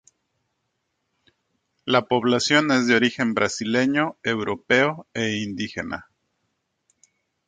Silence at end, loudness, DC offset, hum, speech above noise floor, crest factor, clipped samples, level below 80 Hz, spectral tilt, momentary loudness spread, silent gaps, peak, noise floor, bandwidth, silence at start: 1.45 s; -22 LUFS; under 0.1%; none; 54 dB; 22 dB; under 0.1%; -60 dBFS; -4 dB/octave; 11 LU; none; -2 dBFS; -76 dBFS; 9.4 kHz; 1.85 s